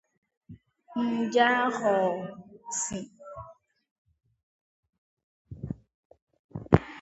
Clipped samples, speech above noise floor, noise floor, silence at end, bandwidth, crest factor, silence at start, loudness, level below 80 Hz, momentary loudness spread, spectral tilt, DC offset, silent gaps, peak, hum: under 0.1%; 26 dB; -52 dBFS; 0 s; 8.2 kHz; 30 dB; 0.5 s; -27 LUFS; -52 dBFS; 22 LU; -5 dB/octave; under 0.1%; 3.91-4.05 s, 4.43-4.83 s, 4.89-5.17 s, 5.23-5.45 s, 5.94-6.10 s, 6.22-6.27 s, 6.39-6.49 s; 0 dBFS; none